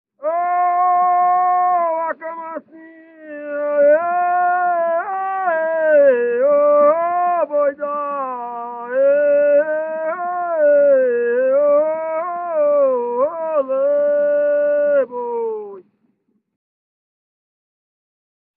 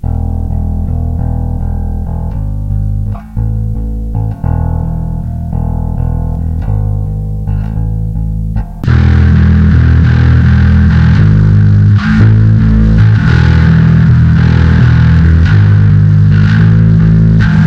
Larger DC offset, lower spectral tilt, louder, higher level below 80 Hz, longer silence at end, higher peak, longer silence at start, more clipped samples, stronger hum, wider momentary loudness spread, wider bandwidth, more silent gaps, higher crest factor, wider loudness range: neither; second, -3.5 dB/octave vs -9 dB/octave; second, -17 LUFS vs -9 LUFS; second, -80 dBFS vs -16 dBFS; first, 2.75 s vs 0 s; second, -4 dBFS vs 0 dBFS; first, 0.2 s vs 0.05 s; second, under 0.1% vs 2%; neither; about the same, 11 LU vs 10 LU; second, 3.1 kHz vs 6.2 kHz; neither; first, 14 dB vs 8 dB; second, 4 LU vs 9 LU